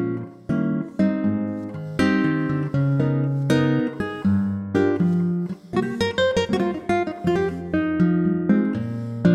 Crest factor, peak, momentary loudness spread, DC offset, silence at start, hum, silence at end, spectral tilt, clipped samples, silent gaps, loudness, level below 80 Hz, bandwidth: 18 dB; -4 dBFS; 7 LU; under 0.1%; 0 s; none; 0 s; -7.5 dB/octave; under 0.1%; none; -22 LUFS; -50 dBFS; 11.5 kHz